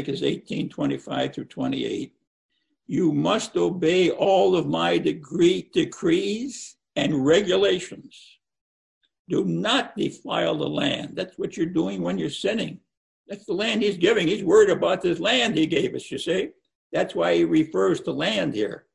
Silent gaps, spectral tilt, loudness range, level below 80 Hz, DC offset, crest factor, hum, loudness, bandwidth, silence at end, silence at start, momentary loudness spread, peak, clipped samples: 2.27-2.49 s, 8.61-9.01 s, 9.19-9.25 s, 12.97-13.25 s, 16.75-16.90 s; -5 dB/octave; 5 LU; -60 dBFS; under 0.1%; 18 dB; none; -23 LUFS; 11 kHz; 0.15 s; 0 s; 11 LU; -6 dBFS; under 0.1%